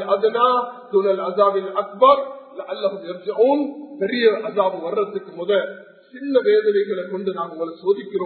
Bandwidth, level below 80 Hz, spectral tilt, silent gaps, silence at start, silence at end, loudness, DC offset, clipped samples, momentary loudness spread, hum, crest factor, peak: 4.5 kHz; -70 dBFS; -10 dB/octave; none; 0 s; 0 s; -20 LUFS; under 0.1%; under 0.1%; 12 LU; none; 18 dB; -2 dBFS